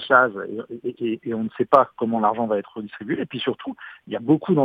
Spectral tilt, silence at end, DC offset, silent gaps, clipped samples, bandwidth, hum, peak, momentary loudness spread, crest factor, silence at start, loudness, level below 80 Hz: -8.5 dB/octave; 0 s; under 0.1%; none; under 0.1%; 5.2 kHz; none; 0 dBFS; 15 LU; 22 dB; 0 s; -23 LUFS; -68 dBFS